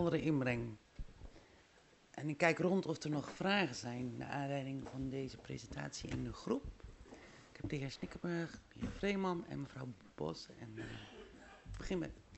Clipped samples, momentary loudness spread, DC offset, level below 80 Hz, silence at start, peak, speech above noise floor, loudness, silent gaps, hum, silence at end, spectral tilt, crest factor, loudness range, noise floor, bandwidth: under 0.1%; 21 LU; under 0.1%; -58 dBFS; 0 s; -18 dBFS; 27 dB; -41 LUFS; none; none; 0 s; -6 dB/octave; 24 dB; 7 LU; -67 dBFS; 8.2 kHz